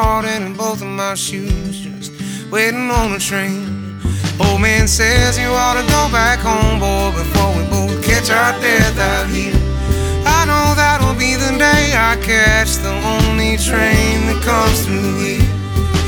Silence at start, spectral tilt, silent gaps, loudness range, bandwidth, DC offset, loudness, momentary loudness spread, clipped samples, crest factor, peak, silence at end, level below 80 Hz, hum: 0 s; -4 dB/octave; none; 6 LU; over 20 kHz; under 0.1%; -14 LUFS; 9 LU; under 0.1%; 14 dB; 0 dBFS; 0 s; -22 dBFS; none